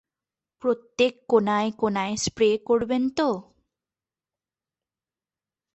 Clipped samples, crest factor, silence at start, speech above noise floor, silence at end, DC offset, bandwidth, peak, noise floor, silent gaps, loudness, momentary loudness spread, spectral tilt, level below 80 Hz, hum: under 0.1%; 20 dB; 0.65 s; over 67 dB; 2.3 s; under 0.1%; 8.4 kHz; -6 dBFS; under -90 dBFS; none; -24 LUFS; 6 LU; -4.5 dB/octave; -60 dBFS; none